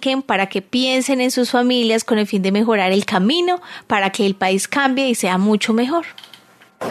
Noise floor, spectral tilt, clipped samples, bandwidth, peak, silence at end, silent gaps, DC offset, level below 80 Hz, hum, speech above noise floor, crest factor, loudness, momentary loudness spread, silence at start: -47 dBFS; -4 dB/octave; under 0.1%; 13.5 kHz; 0 dBFS; 0 s; none; under 0.1%; -66 dBFS; none; 30 dB; 16 dB; -17 LUFS; 5 LU; 0 s